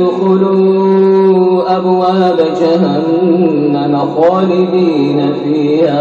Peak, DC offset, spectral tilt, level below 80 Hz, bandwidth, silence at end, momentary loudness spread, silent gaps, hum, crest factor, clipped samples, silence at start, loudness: 0 dBFS; under 0.1%; -8.5 dB/octave; -58 dBFS; 7.2 kHz; 0 s; 4 LU; none; none; 10 dB; under 0.1%; 0 s; -11 LUFS